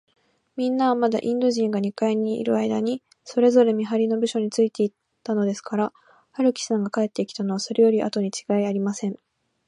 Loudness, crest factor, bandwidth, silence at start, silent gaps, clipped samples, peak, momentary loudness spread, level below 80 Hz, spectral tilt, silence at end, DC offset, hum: -23 LUFS; 18 dB; 11 kHz; 0.55 s; none; under 0.1%; -6 dBFS; 9 LU; -74 dBFS; -5.5 dB/octave; 0.5 s; under 0.1%; none